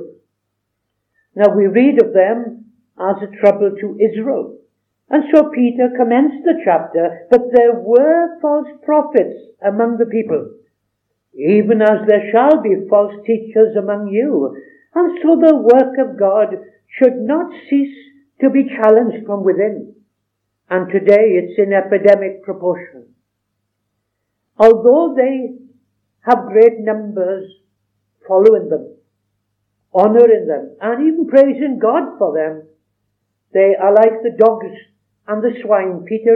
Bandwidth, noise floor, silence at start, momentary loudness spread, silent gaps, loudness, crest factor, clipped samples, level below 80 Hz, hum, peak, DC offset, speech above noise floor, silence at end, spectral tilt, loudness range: 5 kHz; -73 dBFS; 0 s; 11 LU; none; -14 LUFS; 14 dB; 0.2%; -64 dBFS; none; 0 dBFS; under 0.1%; 60 dB; 0 s; -9 dB/octave; 3 LU